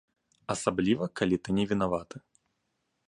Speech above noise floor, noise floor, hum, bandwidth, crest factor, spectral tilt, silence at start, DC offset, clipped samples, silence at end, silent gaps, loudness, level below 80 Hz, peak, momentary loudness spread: 50 dB; -79 dBFS; none; 11.5 kHz; 22 dB; -5.5 dB/octave; 0.5 s; under 0.1%; under 0.1%; 0.9 s; none; -29 LUFS; -58 dBFS; -10 dBFS; 18 LU